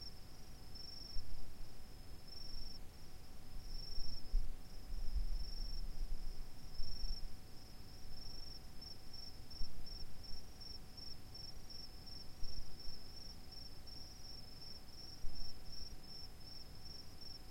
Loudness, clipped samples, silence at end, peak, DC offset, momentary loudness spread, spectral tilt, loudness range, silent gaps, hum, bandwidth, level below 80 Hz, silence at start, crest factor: -52 LUFS; under 0.1%; 0 s; -24 dBFS; under 0.1%; 9 LU; -4 dB/octave; 4 LU; none; none; 16 kHz; -48 dBFS; 0 s; 16 dB